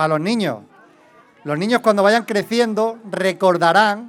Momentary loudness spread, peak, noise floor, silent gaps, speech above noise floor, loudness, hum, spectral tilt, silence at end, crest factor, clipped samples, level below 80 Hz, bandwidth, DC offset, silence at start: 10 LU; 0 dBFS; -50 dBFS; none; 33 dB; -17 LUFS; none; -5 dB/octave; 0 s; 18 dB; under 0.1%; -76 dBFS; 16.5 kHz; under 0.1%; 0 s